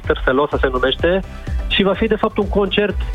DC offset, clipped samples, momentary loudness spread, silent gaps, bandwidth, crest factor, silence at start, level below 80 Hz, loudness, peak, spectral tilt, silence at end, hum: under 0.1%; under 0.1%; 4 LU; none; 10 kHz; 18 dB; 0 s; -26 dBFS; -17 LUFS; 0 dBFS; -7 dB/octave; 0 s; none